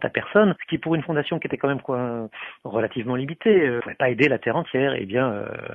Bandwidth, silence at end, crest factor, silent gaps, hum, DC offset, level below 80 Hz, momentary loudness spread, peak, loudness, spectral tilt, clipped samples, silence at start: 7.2 kHz; 0 s; 20 dB; none; none; under 0.1%; -62 dBFS; 9 LU; -4 dBFS; -23 LUFS; -8.5 dB/octave; under 0.1%; 0 s